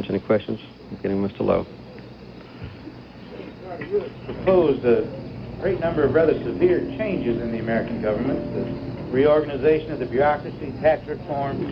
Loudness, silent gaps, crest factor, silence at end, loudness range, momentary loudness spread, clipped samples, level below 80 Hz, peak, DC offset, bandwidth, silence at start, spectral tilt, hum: -23 LUFS; none; 18 dB; 0 s; 8 LU; 20 LU; under 0.1%; -46 dBFS; -6 dBFS; under 0.1%; 5.8 kHz; 0 s; -9.5 dB/octave; none